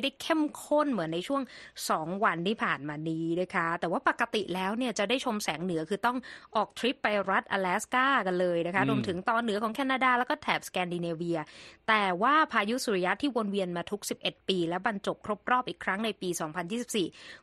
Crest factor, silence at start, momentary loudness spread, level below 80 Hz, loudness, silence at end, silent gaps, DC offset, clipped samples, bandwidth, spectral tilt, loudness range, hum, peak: 20 dB; 0 s; 8 LU; -68 dBFS; -30 LUFS; 0.05 s; none; under 0.1%; under 0.1%; 13 kHz; -4.5 dB/octave; 3 LU; none; -10 dBFS